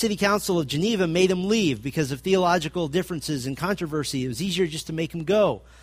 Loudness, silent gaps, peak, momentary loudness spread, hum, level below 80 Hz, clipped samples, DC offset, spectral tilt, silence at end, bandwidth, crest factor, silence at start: -24 LUFS; none; -8 dBFS; 7 LU; none; -50 dBFS; under 0.1%; under 0.1%; -5 dB/octave; 0.25 s; 15.5 kHz; 16 dB; 0 s